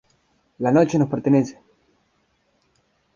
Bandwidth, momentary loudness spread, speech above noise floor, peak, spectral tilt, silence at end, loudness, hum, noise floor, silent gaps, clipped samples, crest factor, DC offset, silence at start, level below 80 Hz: 7.4 kHz; 8 LU; 48 dB; -4 dBFS; -8 dB/octave; 1.65 s; -20 LUFS; none; -66 dBFS; none; under 0.1%; 20 dB; under 0.1%; 0.6 s; -60 dBFS